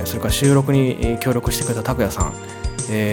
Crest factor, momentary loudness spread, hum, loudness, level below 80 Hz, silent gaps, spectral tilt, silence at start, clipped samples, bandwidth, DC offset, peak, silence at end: 16 dB; 10 LU; none; -19 LUFS; -30 dBFS; none; -5.5 dB/octave; 0 s; under 0.1%; 19 kHz; under 0.1%; -4 dBFS; 0 s